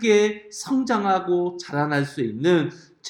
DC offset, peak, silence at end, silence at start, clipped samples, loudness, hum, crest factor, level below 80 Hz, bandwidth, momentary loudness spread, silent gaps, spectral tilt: under 0.1%; -6 dBFS; 0 s; 0 s; under 0.1%; -23 LUFS; none; 16 dB; -66 dBFS; 12 kHz; 7 LU; none; -5.5 dB/octave